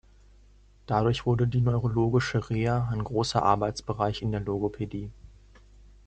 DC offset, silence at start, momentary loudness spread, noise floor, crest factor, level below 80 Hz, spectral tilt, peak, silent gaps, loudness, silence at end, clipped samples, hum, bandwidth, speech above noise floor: under 0.1%; 0.9 s; 7 LU; -56 dBFS; 20 dB; -48 dBFS; -7 dB/octave; -6 dBFS; none; -27 LUFS; 0.8 s; under 0.1%; none; 8.8 kHz; 30 dB